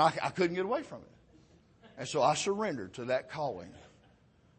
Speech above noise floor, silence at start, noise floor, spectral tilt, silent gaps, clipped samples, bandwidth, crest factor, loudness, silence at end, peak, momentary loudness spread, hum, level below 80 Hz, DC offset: 32 dB; 0 s; -64 dBFS; -4.5 dB/octave; none; under 0.1%; 8.8 kHz; 22 dB; -33 LUFS; 0.7 s; -12 dBFS; 17 LU; none; -68 dBFS; under 0.1%